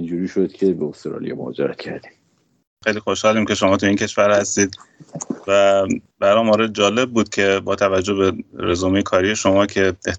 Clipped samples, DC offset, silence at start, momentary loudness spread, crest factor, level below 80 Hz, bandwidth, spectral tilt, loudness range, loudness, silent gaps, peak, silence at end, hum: under 0.1%; under 0.1%; 0 s; 12 LU; 16 dB; -58 dBFS; 8.8 kHz; -4 dB/octave; 5 LU; -18 LUFS; 2.67-2.77 s; -2 dBFS; 0 s; none